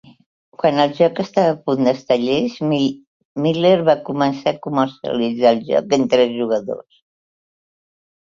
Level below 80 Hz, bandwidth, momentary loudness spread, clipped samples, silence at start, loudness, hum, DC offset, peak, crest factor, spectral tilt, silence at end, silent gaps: -60 dBFS; 7.4 kHz; 7 LU; under 0.1%; 0.6 s; -18 LUFS; none; under 0.1%; -2 dBFS; 16 dB; -6.5 dB/octave; 1.45 s; 3.07-3.35 s